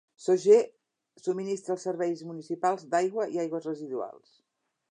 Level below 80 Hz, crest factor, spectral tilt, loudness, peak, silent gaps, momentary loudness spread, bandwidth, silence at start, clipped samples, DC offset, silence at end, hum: -86 dBFS; 20 dB; -5.5 dB/octave; -29 LUFS; -10 dBFS; none; 15 LU; 10 kHz; 0.2 s; under 0.1%; under 0.1%; 0.8 s; none